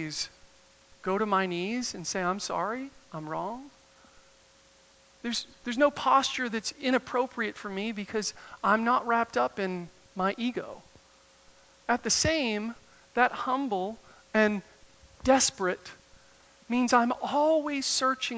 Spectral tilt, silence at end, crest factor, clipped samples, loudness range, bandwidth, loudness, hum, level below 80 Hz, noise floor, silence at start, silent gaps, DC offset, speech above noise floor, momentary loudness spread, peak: -3 dB/octave; 0 s; 22 dB; under 0.1%; 6 LU; 8 kHz; -29 LUFS; none; -60 dBFS; -60 dBFS; 0 s; none; under 0.1%; 31 dB; 14 LU; -8 dBFS